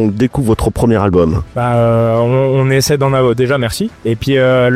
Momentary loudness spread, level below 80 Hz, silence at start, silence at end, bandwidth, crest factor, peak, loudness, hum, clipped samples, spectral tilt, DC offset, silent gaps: 5 LU; -32 dBFS; 0 s; 0 s; 15.5 kHz; 10 dB; -2 dBFS; -13 LUFS; none; under 0.1%; -6.5 dB/octave; under 0.1%; none